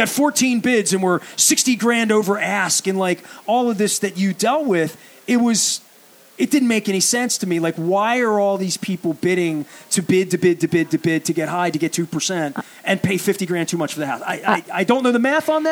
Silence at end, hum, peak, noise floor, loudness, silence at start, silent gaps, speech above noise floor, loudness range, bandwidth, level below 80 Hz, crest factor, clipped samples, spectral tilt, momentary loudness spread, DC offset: 0 s; none; -2 dBFS; -48 dBFS; -19 LUFS; 0 s; none; 30 dB; 3 LU; over 20 kHz; -68 dBFS; 18 dB; under 0.1%; -3.5 dB/octave; 6 LU; under 0.1%